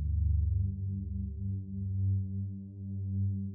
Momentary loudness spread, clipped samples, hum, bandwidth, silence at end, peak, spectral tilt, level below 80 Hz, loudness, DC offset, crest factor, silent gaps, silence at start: 9 LU; under 0.1%; 50 Hz at -45 dBFS; 0.6 kHz; 0 s; -20 dBFS; -15.5 dB/octave; -40 dBFS; -35 LUFS; under 0.1%; 12 dB; none; 0 s